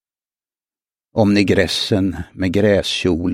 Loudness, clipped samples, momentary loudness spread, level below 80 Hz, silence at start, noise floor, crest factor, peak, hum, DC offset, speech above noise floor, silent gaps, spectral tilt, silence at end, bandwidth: -17 LUFS; under 0.1%; 8 LU; -42 dBFS; 1.15 s; under -90 dBFS; 18 dB; 0 dBFS; none; under 0.1%; over 74 dB; none; -5.5 dB/octave; 0 s; 16 kHz